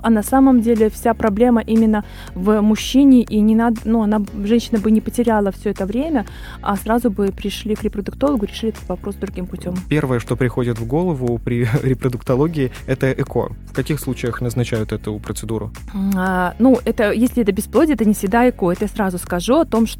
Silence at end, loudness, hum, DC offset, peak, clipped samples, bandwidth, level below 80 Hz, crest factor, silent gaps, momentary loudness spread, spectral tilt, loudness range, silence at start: 0 s; -18 LUFS; none; under 0.1%; -2 dBFS; under 0.1%; 16.5 kHz; -34 dBFS; 16 dB; none; 11 LU; -6.5 dB/octave; 6 LU; 0 s